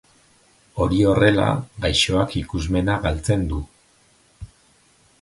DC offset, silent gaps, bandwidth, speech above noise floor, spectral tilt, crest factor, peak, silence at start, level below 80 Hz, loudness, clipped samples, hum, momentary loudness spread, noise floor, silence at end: under 0.1%; none; 11.5 kHz; 38 dB; -5.5 dB/octave; 20 dB; -2 dBFS; 0.75 s; -34 dBFS; -20 LUFS; under 0.1%; none; 11 LU; -57 dBFS; 0.75 s